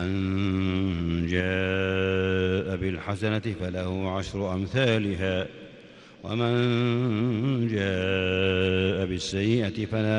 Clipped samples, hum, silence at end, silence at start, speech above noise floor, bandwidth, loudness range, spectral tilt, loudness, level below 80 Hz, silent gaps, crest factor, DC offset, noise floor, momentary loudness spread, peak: under 0.1%; none; 0 s; 0 s; 23 dB; 10 kHz; 3 LU; -6.5 dB/octave; -26 LUFS; -50 dBFS; none; 16 dB; under 0.1%; -49 dBFS; 6 LU; -10 dBFS